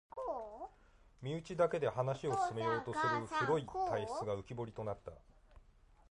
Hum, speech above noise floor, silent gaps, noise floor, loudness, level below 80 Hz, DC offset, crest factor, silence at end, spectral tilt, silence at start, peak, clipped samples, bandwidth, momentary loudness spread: none; 27 dB; none; -65 dBFS; -38 LUFS; -64 dBFS; under 0.1%; 18 dB; 0.5 s; -6 dB/octave; 0.15 s; -20 dBFS; under 0.1%; 11 kHz; 14 LU